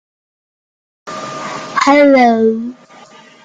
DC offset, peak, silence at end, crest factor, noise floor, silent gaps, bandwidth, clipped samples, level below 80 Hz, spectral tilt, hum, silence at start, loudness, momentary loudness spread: under 0.1%; 0 dBFS; 0.7 s; 14 dB; -40 dBFS; none; 9.2 kHz; under 0.1%; -60 dBFS; -4.5 dB/octave; none; 1.05 s; -11 LUFS; 19 LU